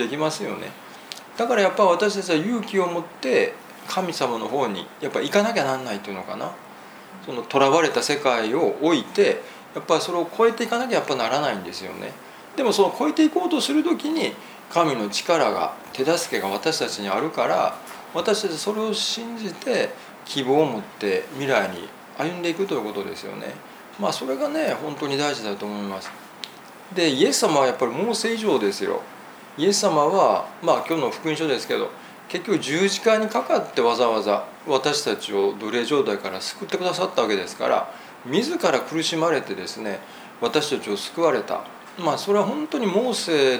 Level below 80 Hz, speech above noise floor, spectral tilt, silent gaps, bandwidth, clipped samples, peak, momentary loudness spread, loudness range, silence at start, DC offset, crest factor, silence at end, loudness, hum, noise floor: -74 dBFS; 20 dB; -3.5 dB/octave; none; over 20 kHz; under 0.1%; -2 dBFS; 14 LU; 4 LU; 0 s; under 0.1%; 20 dB; 0 s; -23 LUFS; none; -42 dBFS